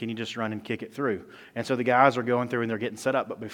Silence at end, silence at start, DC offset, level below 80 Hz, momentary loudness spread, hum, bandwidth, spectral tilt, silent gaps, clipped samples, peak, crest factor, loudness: 0 s; 0 s; under 0.1%; -72 dBFS; 13 LU; none; 17.5 kHz; -5.5 dB/octave; none; under 0.1%; -4 dBFS; 24 dB; -27 LUFS